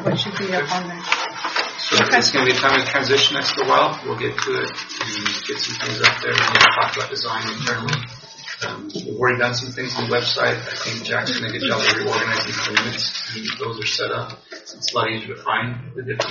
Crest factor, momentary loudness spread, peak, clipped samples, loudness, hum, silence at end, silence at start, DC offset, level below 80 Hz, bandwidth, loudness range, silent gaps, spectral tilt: 20 dB; 12 LU; 0 dBFS; under 0.1%; -19 LUFS; none; 0 s; 0 s; under 0.1%; -58 dBFS; 7.2 kHz; 6 LU; none; -1 dB/octave